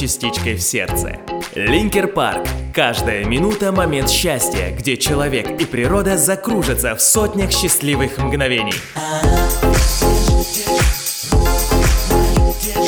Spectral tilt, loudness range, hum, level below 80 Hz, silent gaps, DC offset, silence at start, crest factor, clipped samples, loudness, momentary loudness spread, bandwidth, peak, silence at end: -3.5 dB/octave; 2 LU; none; -22 dBFS; none; under 0.1%; 0 s; 16 dB; under 0.1%; -16 LUFS; 6 LU; over 20 kHz; 0 dBFS; 0 s